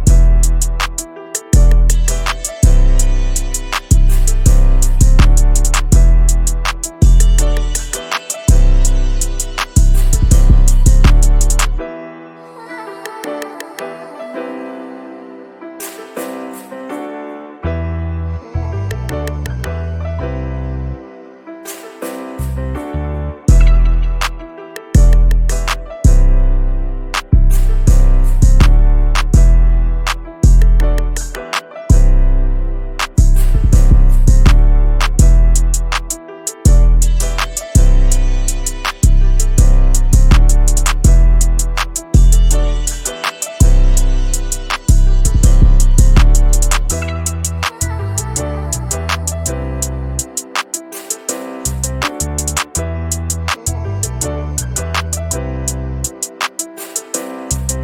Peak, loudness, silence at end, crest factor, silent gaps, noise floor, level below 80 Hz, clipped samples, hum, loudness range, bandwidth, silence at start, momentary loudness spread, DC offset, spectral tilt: 0 dBFS; -15 LUFS; 0 s; 10 dB; none; -35 dBFS; -12 dBFS; under 0.1%; none; 10 LU; 15.5 kHz; 0 s; 14 LU; under 0.1%; -4.5 dB/octave